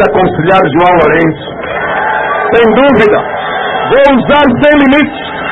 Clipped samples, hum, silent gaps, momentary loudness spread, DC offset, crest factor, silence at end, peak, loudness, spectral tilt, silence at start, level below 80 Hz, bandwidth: 0.3%; none; none; 8 LU; under 0.1%; 8 dB; 0 s; 0 dBFS; -8 LUFS; -7.5 dB/octave; 0 s; -34 dBFS; 6.6 kHz